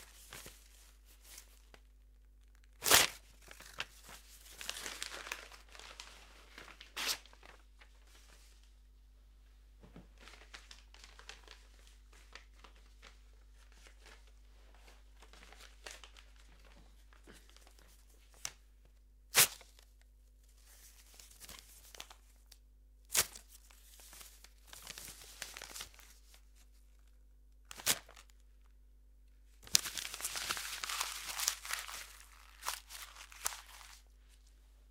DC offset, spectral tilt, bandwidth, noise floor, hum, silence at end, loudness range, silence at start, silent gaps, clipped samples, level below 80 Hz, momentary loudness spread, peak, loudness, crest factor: under 0.1%; 0.5 dB/octave; 16.5 kHz; -62 dBFS; 50 Hz at -60 dBFS; 0 s; 22 LU; 0 s; none; under 0.1%; -62 dBFS; 27 LU; -2 dBFS; -36 LUFS; 42 dB